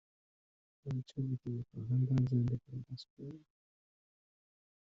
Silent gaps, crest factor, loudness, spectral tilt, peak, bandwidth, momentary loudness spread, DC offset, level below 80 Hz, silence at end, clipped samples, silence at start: 3.10-3.17 s; 16 dB; -37 LUFS; -10 dB/octave; -22 dBFS; 6.2 kHz; 19 LU; under 0.1%; -66 dBFS; 1.55 s; under 0.1%; 0.85 s